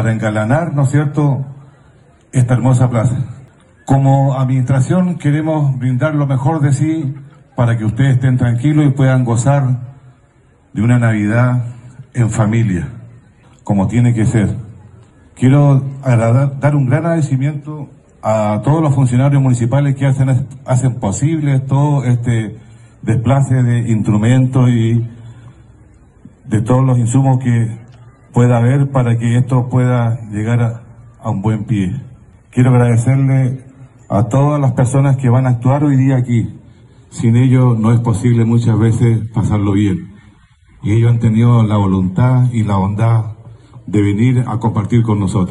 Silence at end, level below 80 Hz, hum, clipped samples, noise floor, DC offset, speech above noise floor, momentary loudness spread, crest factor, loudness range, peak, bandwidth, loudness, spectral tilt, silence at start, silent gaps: 0 s; -42 dBFS; none; under 0.1%; -49 dBFS; under 0.1%; 37 dB; 8 LU; 12 dB; 3 LU; -2 dBFS; 11 kHz; -14 LUFS; -8 dB/octave; 0 s; none